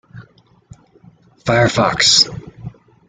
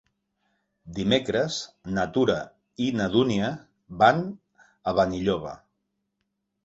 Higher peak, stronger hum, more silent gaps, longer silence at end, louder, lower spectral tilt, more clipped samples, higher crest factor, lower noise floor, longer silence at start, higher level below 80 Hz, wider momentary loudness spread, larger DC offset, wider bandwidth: first, 0 dBFS vs -6 dBFS; neither; neither; second, 0.4 s vs 1.1 s; first, -13 LUFS vs -25 LUFS; second, -3 dB/octave vs -5.5 dB/octave; neither; about the same, 18 dB vs 22 dB; second, -50 dBFS vs -79 dBFS; second, 0.15 s vs 0.85 s; first, -46 dBFS vs -54 dBFS; first, 25 LU vs 18 LU; neither; first, 11 kHz vs 8 kHz